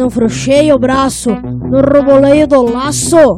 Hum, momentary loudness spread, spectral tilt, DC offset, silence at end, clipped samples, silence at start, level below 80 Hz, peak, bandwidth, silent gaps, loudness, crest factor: none; 7 LU; -5 dB/octave; under 0.1%; 0 s; 0.4%; 0 s; -32 dBFS; 0 dBFS; 14.5 kHz; none; -10 LUFS; 8 dB